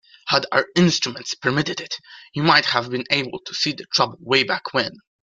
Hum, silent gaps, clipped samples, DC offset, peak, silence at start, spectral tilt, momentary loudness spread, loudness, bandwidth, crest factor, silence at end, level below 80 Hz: none; none; under 0.1%; under 0.1%; -2 dBFS; 0.25 s; -4 dB/octave; 12 LU; -20 LUFS; 7.6 kHz; 20 dB; 0.35 s; -60 dBFS